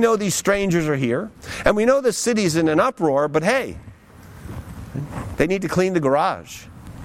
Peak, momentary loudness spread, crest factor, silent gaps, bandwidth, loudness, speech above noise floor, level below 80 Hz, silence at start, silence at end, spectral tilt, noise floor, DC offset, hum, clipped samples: -2 dBFS; 18 LU; 18 dB; none; 16.5 kHz; -20 LUFS; 24 dB; -42 dBFS; 0 s; 0 s; -5 dB/octave; -43 dBFS; under 0.1%; none; under 0.1%